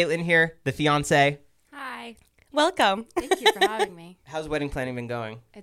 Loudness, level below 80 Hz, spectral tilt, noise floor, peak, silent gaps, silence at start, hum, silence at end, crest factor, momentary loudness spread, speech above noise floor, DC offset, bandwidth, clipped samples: -24 LUFS; -50 dBFS; -4 dB/octave; -46 dBFS; -4 dBFS; none; 0 s; none; 0 s; 20 dB; 16 LU; 21 dB; under 0.1%; 16.5 kHz; under 0.1%